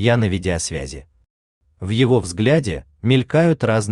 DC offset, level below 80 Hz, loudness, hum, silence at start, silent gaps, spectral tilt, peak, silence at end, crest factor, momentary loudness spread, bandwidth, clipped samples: under 0.1%; -42 dBFS; -19 LUFS; none; 0 s; 1.30-1.61 s; -6 dB/octave; -4 dBFS; 0 s; 16 dB; 13 LU; 11 kHz; under 0.1%